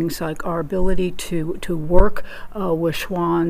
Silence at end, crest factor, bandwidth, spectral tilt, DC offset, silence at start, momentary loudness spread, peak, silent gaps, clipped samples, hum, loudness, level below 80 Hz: 0 s; 18 dB; 15.5 kHz; -6 dB/octave; under 0.1%; 0 s; 8 LU; 0 dBFS; none; 0.3%; none; -22 LUFS; -24 dBFS